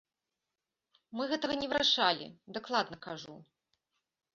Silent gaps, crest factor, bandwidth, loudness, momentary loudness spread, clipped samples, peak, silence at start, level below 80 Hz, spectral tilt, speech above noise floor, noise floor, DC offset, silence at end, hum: none; 24 dB; 7.6 kHz; -31 LUFS; 18 LU; under 0.1%; -12 dBFS; 1.1 s; -72 dBFS; -0.5 dB/octave; 56 dB; -89 dBFS; under 0.1%; 0.9 s; none